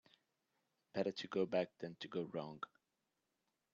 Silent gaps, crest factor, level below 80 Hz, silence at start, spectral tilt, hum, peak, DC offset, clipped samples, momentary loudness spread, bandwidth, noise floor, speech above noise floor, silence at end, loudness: none; 22 dB; -86 dBFS; 0.95 s; -4.5 dB/octave; none; -24 dBFS; under 0.1%; under 0.1%; 12 LU; 7.4 kHz; -88 dBFS; 46 dB; 1.1 s; -43 LUFS